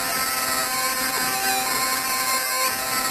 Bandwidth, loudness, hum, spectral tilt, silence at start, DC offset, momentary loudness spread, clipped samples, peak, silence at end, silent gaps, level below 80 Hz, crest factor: 14 kHz; -21 LUFS; none; 0 dB/octave; 0 s; under 0.1%; 1 LU; under 0.1%; -8 dBFS; 0 s; none; -54 dBFS; 16 dB